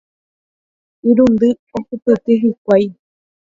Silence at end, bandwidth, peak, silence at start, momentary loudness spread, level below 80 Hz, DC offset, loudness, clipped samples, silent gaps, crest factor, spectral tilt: 0.6 s; 7.4 kHz; 0 dBFS; 1.05 s; 12 LU; -52 dBFS; under 0.1%; -15 LUFS; under 0.1%; 1.59-1.67 s, 2.02-2.06 s, 2.58-2.65 s; 16 dB; -8.5 dB/octave